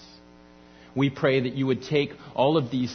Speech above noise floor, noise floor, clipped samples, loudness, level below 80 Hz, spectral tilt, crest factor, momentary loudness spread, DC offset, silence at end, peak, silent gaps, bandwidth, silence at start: 27 dB; -51 dBFS; under 0.1%; -25 LUFS; -60 dBFS; -7 dB/octave; 18 dB; 5 LU; under 0.1%; 0 s; -8 dBFS; none; 6.6 kHz; 0 s